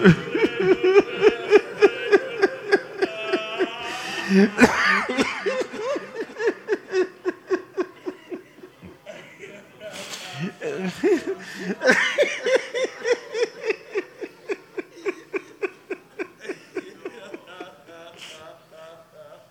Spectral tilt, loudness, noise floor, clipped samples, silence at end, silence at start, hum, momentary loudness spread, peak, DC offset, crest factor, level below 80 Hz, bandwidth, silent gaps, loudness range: -5 dB/octave; -23 LUFS; -46 dBFS; under 0.1%; 0.15 s; 0 s; none; 22 LU; 0 dBFS; under 0.1%; 24 dB; -60 dBFS; 14.5 kHz; none; 14 LU